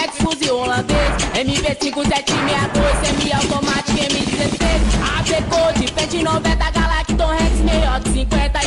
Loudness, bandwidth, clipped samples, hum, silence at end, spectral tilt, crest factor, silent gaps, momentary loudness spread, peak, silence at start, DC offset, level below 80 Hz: -17 LUFS; 11.5 kHz; under 0.1%; none; 0 s; -4 dB/octave; 10 dB; none; 2 LU; -6 dBFS; 0 s; under 0.1%; -22 dBFS